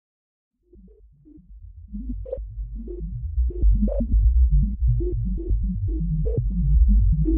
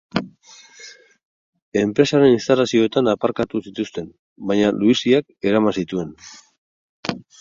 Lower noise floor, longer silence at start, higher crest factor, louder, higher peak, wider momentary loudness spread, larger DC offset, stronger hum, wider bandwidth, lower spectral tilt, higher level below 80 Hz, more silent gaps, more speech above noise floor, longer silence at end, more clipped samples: first, -51 dBFS vs -47 dBFS; first, 1.5 s vs 0.15 s; second, 14 dB vs 20 dB; second, -24 LUFS vs -19 LUFS; second, -8 dBFS vs 0 dBFS; second, 15 LU vs 20 LU; neither; neither; second, 0.8 kHz vs 7.6 kHz; first, -16.5 dB/octave vs -5.5 dB/octave; first, -22 dBFS vs -56 dBFS; second, none vs 1.25-1.53 s, 1.62-1.72 s, 4.19-4.36 s, 6.58-7.03 s; about the same, 31 dB vs 29 dB; second, 0 s vs 0.2 s; neither